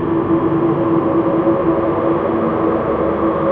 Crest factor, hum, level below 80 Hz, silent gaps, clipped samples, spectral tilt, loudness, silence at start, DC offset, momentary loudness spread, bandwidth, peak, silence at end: 12 dB; none; -42 dBFS; none; under 0.1%; -11 dB/octave; -16 LUFS; 0 s; under 0.1%; 2 LU; 4 kHz; -4 dBFS; 0 s